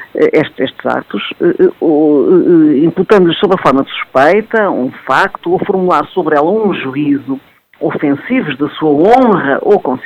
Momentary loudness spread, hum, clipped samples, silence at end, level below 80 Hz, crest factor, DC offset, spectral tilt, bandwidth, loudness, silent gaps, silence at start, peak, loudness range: 9 LU; none; 0.4%; 0 s; -50 dBFS; 10 dB; under 0.1%; -7.5 dB/octave; 9 kHz; -11 LUFS; none; 0 s; 0 dBFS; 4 LU